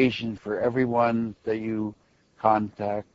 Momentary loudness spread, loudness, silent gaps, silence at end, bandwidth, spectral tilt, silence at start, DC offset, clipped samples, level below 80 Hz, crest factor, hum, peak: 8 LU; -26 LUFS; none; 0.1 s; 7.6 kHz; -8 dB/octave; 0 s; under 0.1%; under 0.1%; -60 dBFS; 20 dB; none; -6 dBFS